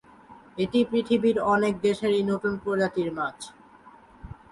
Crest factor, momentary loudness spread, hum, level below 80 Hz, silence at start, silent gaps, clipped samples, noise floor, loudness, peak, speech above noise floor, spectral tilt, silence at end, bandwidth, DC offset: 16 dB; 19 LU; none; -56 dBFS; 0.3 s; none; under 0.1%; -52 dBFS; -25 LUFS; -10 dBFS; 27 dB; -6 dB/octave; 0.2 s; 11.5 kHz; under 0.1%